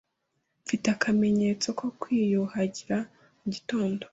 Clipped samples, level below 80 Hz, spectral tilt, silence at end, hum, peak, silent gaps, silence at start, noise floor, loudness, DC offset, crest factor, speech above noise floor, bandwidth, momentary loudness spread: under 0.1%; -64 dBFS; -5.5 dB/octave; 0.05 s; none; -12 dBFS; none; 0.65 s; -78 dBFS; -28 LUFS; under 0.1%; 18 dB; 51 dB; 8 kHz; 11 LU